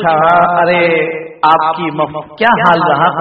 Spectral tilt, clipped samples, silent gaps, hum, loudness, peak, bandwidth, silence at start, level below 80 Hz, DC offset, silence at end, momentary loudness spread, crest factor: -7.5 dB/octave; 0.1%; none; none; -11 LUFS; 0 dBFS; 5.8 kHz; 0 s; -50 dBFS; under 0.1%; 0 s; 8 LU; 12 dB